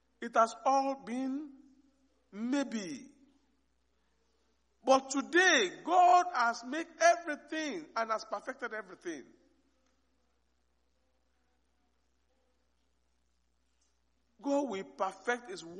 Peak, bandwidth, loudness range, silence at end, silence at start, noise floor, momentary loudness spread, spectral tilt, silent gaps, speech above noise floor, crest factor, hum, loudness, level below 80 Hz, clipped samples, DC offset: -12 dBFS; 10.5 kHz; 15 LU; 0 s; 0.2 s; -77 dBFS; 17 LU; -2 dB/octave; none; 46 dB; 22 dB; none; -31 LUFS; -80 dBFS; under 0.1%; under 0.1%